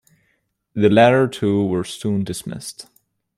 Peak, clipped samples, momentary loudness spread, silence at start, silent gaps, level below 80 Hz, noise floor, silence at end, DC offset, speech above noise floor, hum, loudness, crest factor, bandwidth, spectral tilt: -2 dBFS; under 0.1%; 19 LU; 0.75 s; none; -58 dBFS; -68 dBFS; 0.55 s; under 0.1%; 50 dB; none; -18 LUFS; 18 dB; 14 kHz; -6 dB/octave